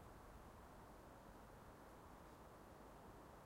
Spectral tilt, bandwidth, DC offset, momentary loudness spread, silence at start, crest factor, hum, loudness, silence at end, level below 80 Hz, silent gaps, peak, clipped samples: -5.5 dB/octave; 16 kHz; under 0.1%; 1 LU; 0 s; 14 dB; none; -62 LUFS; 0 s; -68 dBFS; none; -48 dBFS; under 0.1%